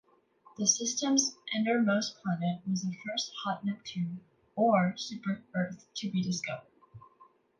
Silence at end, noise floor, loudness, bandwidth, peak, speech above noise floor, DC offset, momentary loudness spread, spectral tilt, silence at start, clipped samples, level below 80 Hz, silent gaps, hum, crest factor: 0.35 s; -62 dBFS; -31 LUFS; 11 kHz; -12 dBFS; 31 dB; under 0.1%; 10 LU; -4 dB/octave; 0.6 s; under 0.1%; -76 dBFS; none; none; 22 dB